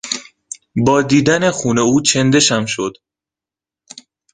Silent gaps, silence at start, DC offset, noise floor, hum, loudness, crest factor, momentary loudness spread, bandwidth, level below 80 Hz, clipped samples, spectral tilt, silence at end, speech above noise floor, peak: none; 0.05 s; under 0.1%; -89 dBFS; none; -14 LUFS; 16 dB; 13 LU; 10 kHz; -50 dBFS; under 0.1%; -4 dB/octave; 1.4 s; 75 dB; 0 dBFS